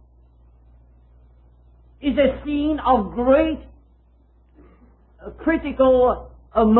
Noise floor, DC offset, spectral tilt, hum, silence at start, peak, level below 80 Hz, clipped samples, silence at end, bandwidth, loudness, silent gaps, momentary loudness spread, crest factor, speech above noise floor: -55 dBFS; under 0.1%; -11 dB/octave; none; 2 s; -4 dBFS; -40 dBFS; under 0.1%; 0 s; 4.2 kHz; -20 LUFS; none; 12 LU; 18 dB; 37 dB